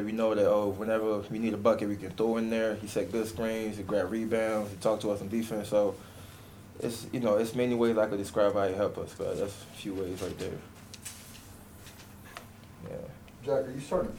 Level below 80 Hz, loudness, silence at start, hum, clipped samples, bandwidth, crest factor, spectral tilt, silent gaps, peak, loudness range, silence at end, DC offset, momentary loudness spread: -58 dBFS; -31 LUFS; 0 s; none; under 0.1%; 18 kHz; 18 dB; -6 dB/octave; none; -12 dBFS; 10 LU; 0 s; under 0.1%; 21 LU